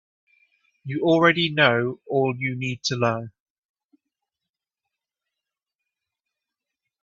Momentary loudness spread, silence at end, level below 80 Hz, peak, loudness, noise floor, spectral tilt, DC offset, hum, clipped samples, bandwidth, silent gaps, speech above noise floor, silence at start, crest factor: 14 LU; 3.75 s; -66 dBFS; 0 dBFS; -22 LUFS; -87 dBFS; -5 dB/octave; under 0.1%; none; under 0.1%; 7.6 kHz; none; 65 dB; 0.85 s; 26 dB